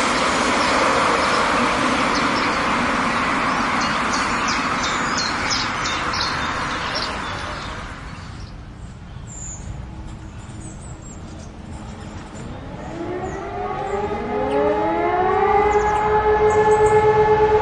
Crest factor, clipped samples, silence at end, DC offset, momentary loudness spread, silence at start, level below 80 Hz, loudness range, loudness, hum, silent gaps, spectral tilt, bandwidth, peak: 16 dB; under 0.1%; 0 s; under 0.1%; 20 LU; 0 s; -38 dBFS; 17 LU; -19 LUFS; none; none; -4 dB/octave; 11.5 kHz; -4 dBFS